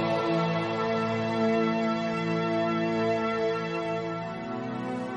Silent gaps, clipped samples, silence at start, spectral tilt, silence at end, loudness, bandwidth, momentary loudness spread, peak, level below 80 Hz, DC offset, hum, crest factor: none; under 0.1%; 0 s; -7 dB/octave; 0 s; -28 LUFS; 8.4 kHz; 7 LU; -14 dBFS; -64 dBFS; under 0.1%; none; 14 dB